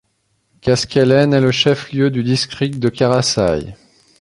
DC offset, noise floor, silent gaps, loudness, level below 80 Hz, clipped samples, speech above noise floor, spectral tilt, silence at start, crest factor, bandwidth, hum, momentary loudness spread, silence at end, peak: under 0.1%; -65 dBFS; none; -15 LUFS; -44 dBFS; under 0.1%; 50 dB; -5 dB/octave; 0.65 s; 16 dB; 11.5 kHz; none; 7 LU; 0.45 s; 0 dBFS